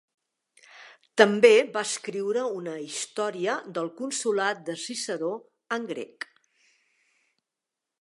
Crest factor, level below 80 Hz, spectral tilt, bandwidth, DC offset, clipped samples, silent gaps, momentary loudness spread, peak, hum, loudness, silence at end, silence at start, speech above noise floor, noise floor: 26 dB; -84 dBFS; -3 dB/octave; 11.5 kHz; under 0.1%; under 0.1%; none; 17 LU; -2 dBFS; none; -26 LUFS; 1.95 s; 0.75 s; 62 dB; -87 dBFS